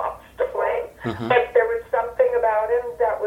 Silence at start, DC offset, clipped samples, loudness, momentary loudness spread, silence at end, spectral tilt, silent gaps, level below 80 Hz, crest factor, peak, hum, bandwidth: 0 s; under 0.1%; under 0.1%; -22 LUFS; 10 LU; 0 s; -6.5 dB/octave; none; -52 dBFS; 18 dB; -2 dBFS; none; 12 kHz